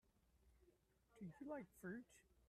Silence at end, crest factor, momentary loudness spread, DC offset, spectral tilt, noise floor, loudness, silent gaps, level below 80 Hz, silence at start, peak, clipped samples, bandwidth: 0.05 s; 20 dB; 6 LU; under 0.1%; -7 dB/octave; -79 dBFS; -56 LUFS; none; -80 dBFS; 0.35 s; -40 dBFS; under 0.1%; 13.5 kHz